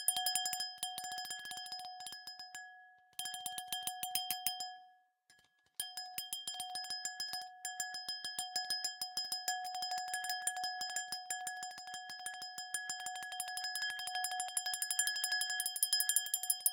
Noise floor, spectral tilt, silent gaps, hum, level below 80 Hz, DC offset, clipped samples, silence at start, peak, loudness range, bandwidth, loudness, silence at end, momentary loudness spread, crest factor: -71 dBFS; 3 dB/octave; none; none; -88 dBFS; under 0.1%; under 0.1%; 0 s; -14 dBFS; 7 LU; 18 kHz; -38 LUFS; 0 s; 12 LU; 28 dB